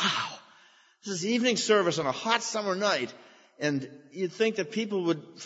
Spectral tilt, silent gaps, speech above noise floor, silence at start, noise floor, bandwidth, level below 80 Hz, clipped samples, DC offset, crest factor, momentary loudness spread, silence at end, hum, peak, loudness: -3.5 dB/octave; none; 31 dB; 0 s; -59 dBFS; 8 kHz; -76 dBFS; under 0.1%; under 0.1%; 22 dB; 12 LU; 0 s; none; -8 dBFS; -28 LUFS